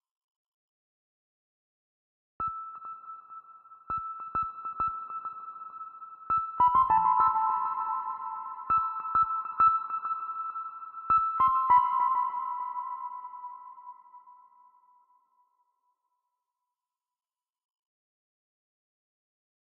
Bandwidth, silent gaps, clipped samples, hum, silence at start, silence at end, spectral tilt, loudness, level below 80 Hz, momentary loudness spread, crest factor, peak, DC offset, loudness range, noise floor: 4.2 kHz; none; under 0.1%; none; 2.4 s; 5.3 s; -3.5 dB/octave; -28 LUFS; -64 dBFS; 20 LU; 20 dB; -12 dBFS; under 0.1%; 16 LU; under -90 dBFS